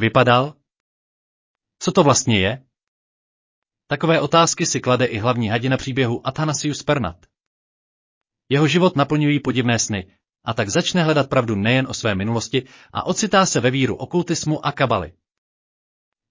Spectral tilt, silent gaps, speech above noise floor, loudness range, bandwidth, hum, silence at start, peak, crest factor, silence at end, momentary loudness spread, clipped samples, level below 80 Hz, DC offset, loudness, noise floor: -4.5 dB/octave; 0.80-1.55 s, 2.88-3.62 s, 7.47-8.21 s; over 71 dB; 3 LU; 7.8 kHz; none; 0 s; -2 dBFS; 18 dB; 1.2 s; 9 LU; under 0.1%; -48 dBFS; under 0.1%; -19 LUFS; under -90 dBFS